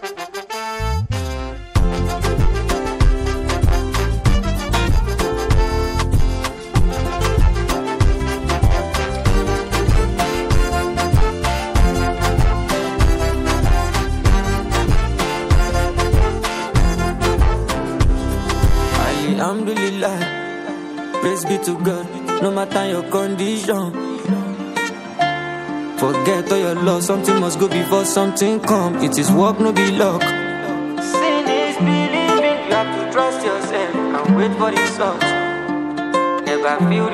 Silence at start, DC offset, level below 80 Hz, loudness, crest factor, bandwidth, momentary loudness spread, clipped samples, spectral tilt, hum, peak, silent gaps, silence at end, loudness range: 0 s; under 0.1%; -22 dBFS; -19 LUFS; 16 dB; 16 kHz; 6 LU; under 0.1%; -5.5 dB/octave; none; 0 dBFS; none; 0 s; 4 LU